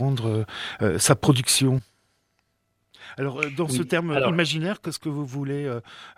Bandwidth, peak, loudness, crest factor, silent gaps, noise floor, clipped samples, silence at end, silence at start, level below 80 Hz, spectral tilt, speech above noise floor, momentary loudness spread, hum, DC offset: 16 kHz; -2 dBFS; -24 LUFS; 22 dB; none; -72 dBFS; under 0.1%; 0.05 s; 0 s; -56 dBFS; -4.5 dB/octave; 48 dB; 12 LU; none; under 0.1%